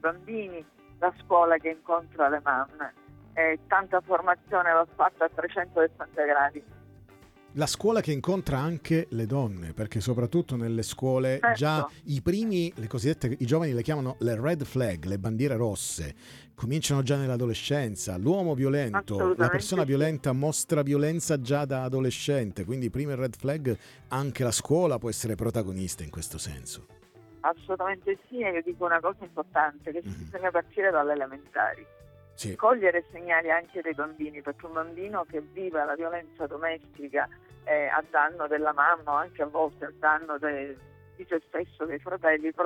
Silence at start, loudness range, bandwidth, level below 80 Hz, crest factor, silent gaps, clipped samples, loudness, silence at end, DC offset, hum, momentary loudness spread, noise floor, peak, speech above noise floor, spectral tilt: 0.05 s; 4 LU; 16.5 kHz; -56 dBFS; 20 dB; none; under 0.1%; -28 LUFS; 0 s; under 0.1%; none; 11 LU; -54 dBFS; -8 dBFS; 26 dB; -5.5 dB/octave